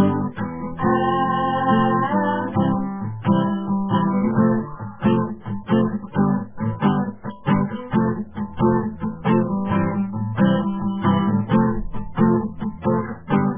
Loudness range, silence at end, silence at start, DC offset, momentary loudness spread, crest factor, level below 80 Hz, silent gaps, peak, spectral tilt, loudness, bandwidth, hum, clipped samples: 2 LU; 0 s; 0 s; 0.6%; 9 LU; 16 dB; -44 dBFS; none; -4 dBFS; -12 dB/octave; -21 LUFS; 3.6 kHz; none; under 0.1%